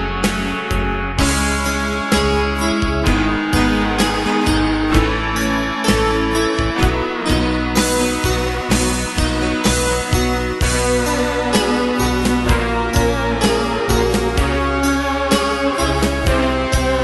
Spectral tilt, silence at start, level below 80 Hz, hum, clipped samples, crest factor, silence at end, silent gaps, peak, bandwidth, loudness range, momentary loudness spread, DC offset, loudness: -4.5 dB/octave; 0 s; -24 dBFS; none; under 0.1%; 16 dB; 0 s; none; -2 dBFS; 12.5 kHz; 1 LU; 3 LU; under 0.1%; -17 LUFS